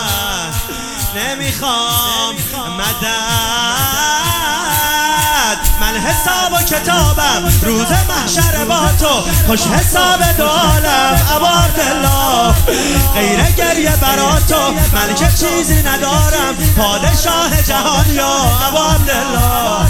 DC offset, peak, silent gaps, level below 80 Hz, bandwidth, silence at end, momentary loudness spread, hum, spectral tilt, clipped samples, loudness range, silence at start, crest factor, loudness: under 0.1%; 0 dBFS; none; -20 dBFS; 19 kHz; 0 s; 5 LU; none; -3.5 dB/octave; under 0.1%; 3 LU; 0 s; 12 dB; -12 LUFS